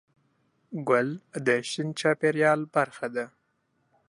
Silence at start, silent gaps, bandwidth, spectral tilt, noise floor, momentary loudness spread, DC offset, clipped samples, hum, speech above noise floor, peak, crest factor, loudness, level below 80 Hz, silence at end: 0.7 s; none; 11.5 kHz; -5 dB/octave; -73 dBFS; 12 LU; under 0.1%; under 0.1%; none; 47 dB; -8 dBFS; 20 dB; -27 LUFS; -78 dBFS; 0.85 s